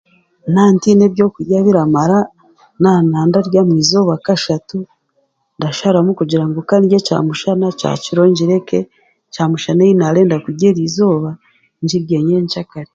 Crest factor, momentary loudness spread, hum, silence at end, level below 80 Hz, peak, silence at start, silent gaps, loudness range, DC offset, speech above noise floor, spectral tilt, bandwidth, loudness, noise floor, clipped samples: 14 dB; 10 LU; none; 0.1 s; -54 dBFS; 0 dBFS; 0.45 s; none; 3 LU; under 0.1%; 50 dB; -6.5 dB/octave; 7.8 kHz; -13 LUFS; -63 dBFS; under 0.1%